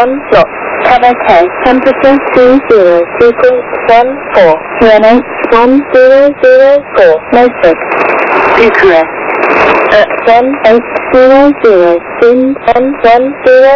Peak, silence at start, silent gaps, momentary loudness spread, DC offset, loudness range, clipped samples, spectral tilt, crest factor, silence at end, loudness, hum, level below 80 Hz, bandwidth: 0 dBFS; 0 s; none; 4 LU; under 0.1%; 1 LU; 20%; -6 dB/octave; 6 dB; 0 s; -6 LUFS; none; -36 dBFS; 6 kHz